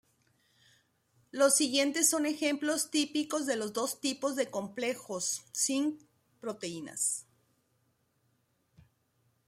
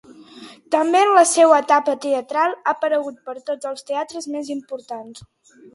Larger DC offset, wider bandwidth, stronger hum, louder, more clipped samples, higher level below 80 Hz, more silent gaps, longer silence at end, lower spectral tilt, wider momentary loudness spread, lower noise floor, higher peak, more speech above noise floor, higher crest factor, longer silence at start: neither; first, 16 kHz vs 11.5 kHz; neither; second, -31 LUFS vs -18 LUFS; neither; second, -82 dBFS vs -68 dBFS; neither; first, 2.25 s vs 0.55 s; about the same, -1.5 dB/octave vs -2 dB/octave; second, 13 LU vs 18 LU; first, -75 dBFS vs -42 dBFS; second, -12 dBFS vs 0 dBFS; first, 43 dB vs 24 dB; about the same, 22 dB vs 18 dB; first, 1.35 s vs 0.2 s